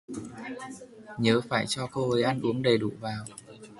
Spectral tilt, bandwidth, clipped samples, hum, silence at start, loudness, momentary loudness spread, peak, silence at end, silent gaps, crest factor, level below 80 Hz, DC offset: -5.5 dB/octave; 11.5 kHz; under 0.1%; none; 0.1 s; -28 LUFS; 18 LU; -8 dBFS; 0 s; none; 20 dB; -62 dBFS; under 0.1%